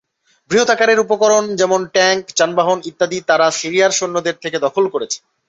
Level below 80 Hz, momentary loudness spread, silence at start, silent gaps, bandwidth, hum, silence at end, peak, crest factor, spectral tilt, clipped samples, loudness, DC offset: -62 dBFS; 7 LU; 0.5 s; none; 8.2 kHz; none; 0.3 s; -2 dBFS; 14 dB; -2.5 dB/octave; under 0.1%; -15 LUFS; under 0.1%